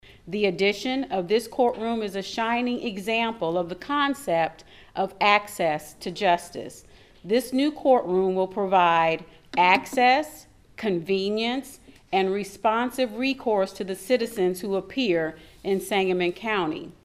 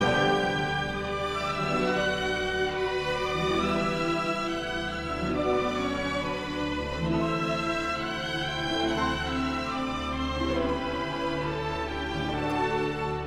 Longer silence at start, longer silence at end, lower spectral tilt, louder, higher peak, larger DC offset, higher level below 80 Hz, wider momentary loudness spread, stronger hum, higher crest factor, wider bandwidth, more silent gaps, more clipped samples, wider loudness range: first, 0.25 s vs 0 s; first, 0.15 s vs 0 s; about the same, -4.5 dB/octave vs -5 dB/octave; first, -24 LUFS vs -28 LUFS; first, -4 dBFS vs -12 dBFS; neither; second, -58 dBFS vs -44 dBFS; first, 10 LU vs 4 LU; neither; about the same, 20 dB vs 16 dB; about the same, 15.5 kHz vs 15 kHz; neither; neither; about the same, 4 LU vs 2 LU